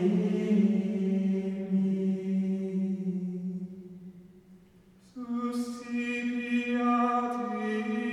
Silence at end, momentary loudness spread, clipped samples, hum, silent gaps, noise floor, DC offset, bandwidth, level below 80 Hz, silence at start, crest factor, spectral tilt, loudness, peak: 0 s; 14 LU; under 0.1%; none; none; -58 dBFS; under 0.1%; 10.5 kHz; -70 dBFS; 0 s; 14 dB; -8 dB/octave; -30 LUFS; -16 dBFS